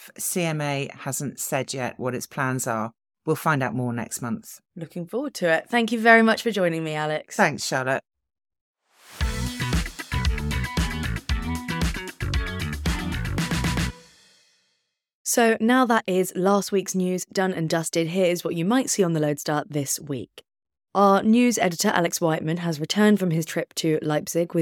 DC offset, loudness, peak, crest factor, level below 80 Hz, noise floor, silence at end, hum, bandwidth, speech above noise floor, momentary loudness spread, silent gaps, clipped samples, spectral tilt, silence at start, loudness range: under 0.1%; -24 LUFS; -2 dBFS; 22 dB; -38 dBFS; -74 dBFS; 0 s; none; 19 kHz; 51 dB; 10 LU; 8.61-8.74 s, 15.13-15.25 s; under 0.1%; -4.5 dB/octave; 0 s; 6 LU